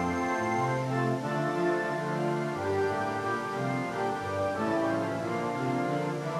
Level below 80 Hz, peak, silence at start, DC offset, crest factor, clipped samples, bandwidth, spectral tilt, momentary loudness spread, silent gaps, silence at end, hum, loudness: -64 dBFS; -18 dBFS; 0 s; under 0.1%; 12 dB; under 0.1%; 14.5 kHz; -6.5 dB/octave; 3 LU; none; 0 s; none; -30 LUFS